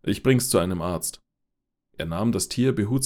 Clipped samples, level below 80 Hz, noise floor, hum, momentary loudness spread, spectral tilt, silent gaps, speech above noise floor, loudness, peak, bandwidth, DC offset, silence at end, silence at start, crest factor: under 0.1%; -48 dBFS; -80 dBFS; none; 11 LU; -5 dB/octave; none; 56 dB; -24 LUFS; -6 dBFS; 18 kHz; under 0.1%; 0 s; 0.05 s; 18 dB